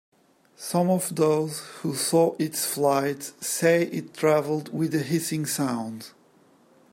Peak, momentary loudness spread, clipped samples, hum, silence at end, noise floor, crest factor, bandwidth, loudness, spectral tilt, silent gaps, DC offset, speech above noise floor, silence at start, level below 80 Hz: -8 dBFS; 10 LU; under 0.1%; none; 0.85 s; -58 dBFS; 18 dB; 16.5 kHz; -25 LUFS; -4.5 dB/octave; none; under 0.1%; 34 dB; 0.6 s; -72 dBFS